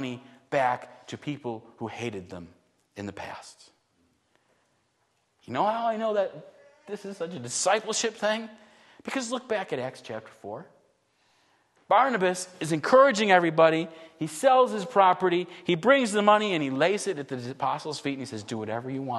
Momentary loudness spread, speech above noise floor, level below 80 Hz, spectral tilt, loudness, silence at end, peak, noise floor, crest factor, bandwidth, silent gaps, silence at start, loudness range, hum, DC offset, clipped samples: 19 LU; 46 dB; -76 dBFS; -4 dB/octave; -26 LUFS; 0 s; -4 dBFS; -72 dBFS; 22 dB; 12.5 kHz; none; 0 s; 16 LU; none; under 0.1%; under 0.1%